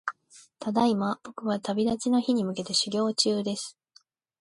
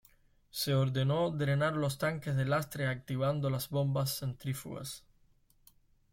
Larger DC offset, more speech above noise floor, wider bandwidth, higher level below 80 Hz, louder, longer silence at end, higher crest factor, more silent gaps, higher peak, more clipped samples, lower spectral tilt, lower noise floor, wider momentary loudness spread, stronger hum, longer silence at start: neither; about the same, 36 dB vs 35 dB; second, 11.5 kHz vs 16.5 kHz; second, -68 dBFS vs -62 dBFS; first, -27 LUFS vs -33 LUFS; second, 0.7 s vs 1.15 s; about the same, 20 dB vs 16 dB; neither; first, -8 dBFS vs -18 dBFS; neither; second, -4 dB/octave vs -5.5 dB/octave; second, -62 dBFS vs -67 dBFS; about the same, 10 LU vs 10 LU; neither; second, 0.05 s vs 0.55 s